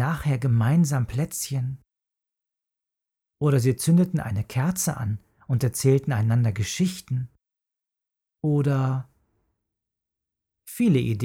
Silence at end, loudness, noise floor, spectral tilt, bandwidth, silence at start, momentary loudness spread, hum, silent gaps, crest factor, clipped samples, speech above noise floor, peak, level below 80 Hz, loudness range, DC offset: 0 s; -24 LUFS; -88 dBFS; -6.5 dB/octave; 17 kHz; 0 s; 10 LU; none; none; 16 dB; under 0.1%; 65 dB; -8 dBFS; -54 dBFS; 6 LU; under 0.1%